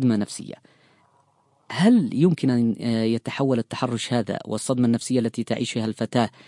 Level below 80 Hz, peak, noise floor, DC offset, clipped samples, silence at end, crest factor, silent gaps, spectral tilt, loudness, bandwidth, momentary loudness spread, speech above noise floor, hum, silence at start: -66 dBFS; -4 dBFS; -63 dBFS; under 0.1%; under 0.1%; 0.2 s; 18 dB; none; -6 dB/octave; -23 LUFS; 11.5 kHz; 9 LU; 41 dB; none; 0 s